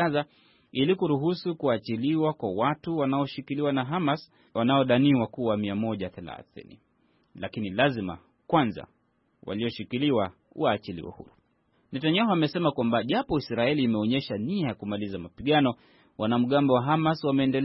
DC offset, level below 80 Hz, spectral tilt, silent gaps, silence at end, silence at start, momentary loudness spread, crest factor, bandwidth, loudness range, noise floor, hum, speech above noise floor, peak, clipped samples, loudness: under 0.1%; -60 dBFS; -10.5 dB/octave; none; 0 s; 0 s; 13 LU; 18 dB; 5.8 kHz; 5 LU; -69 dBFS; none; 42 dB; -10 dBFS; under 0.1%; -27 LUFS